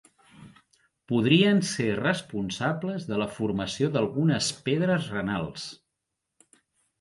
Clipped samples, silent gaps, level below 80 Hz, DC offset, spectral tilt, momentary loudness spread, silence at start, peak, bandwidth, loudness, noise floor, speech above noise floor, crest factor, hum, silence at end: under 0.1%; none; -58 dBFS; under 0.1%; -5 dB/octave; 11 LU; 0.4 s; -8 dBFS; 11.5 kHz; -26 LUFS; -83 dBFS; 57 dB; 20 dB; none; 1.25 s